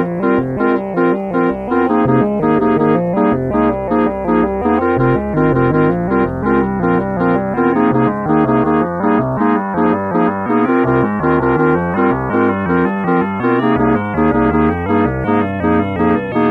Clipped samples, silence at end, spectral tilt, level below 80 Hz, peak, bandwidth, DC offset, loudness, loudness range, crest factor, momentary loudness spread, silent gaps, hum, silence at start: under 0.1%; 0 s; -10 dB/octave; -36 dBFS; -2 dBFS; 4.5 kHz; under 0.1%; -14 LUFS; 0 LU; 12 dB; 3 LU; none; none; 0 s